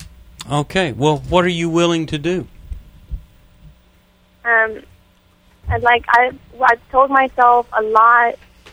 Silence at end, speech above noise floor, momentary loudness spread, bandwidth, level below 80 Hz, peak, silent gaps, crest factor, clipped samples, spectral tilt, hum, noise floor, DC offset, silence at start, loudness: 0.4 s; 38 dB; 23 LU; over 20 kHz; -38 dBFS; 0 dBFS; none; 18 dB; under 0.1%; -5.5 dB/octave; none; -53 dBFS; under 0.1%; 0 s; -15 LUFS